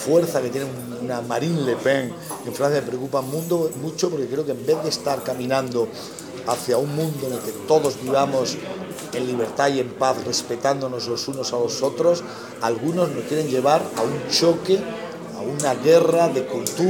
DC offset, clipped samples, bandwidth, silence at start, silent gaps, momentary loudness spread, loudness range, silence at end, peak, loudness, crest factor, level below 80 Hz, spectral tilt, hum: under 0.1%; under 0.1%; 17 kHz; 0 s; none; 11 LU; 4 LU; 0 s; -4 dBFS; -22 LUFS; 18 dB; -66 dBFS; -4.5 dB/octave; none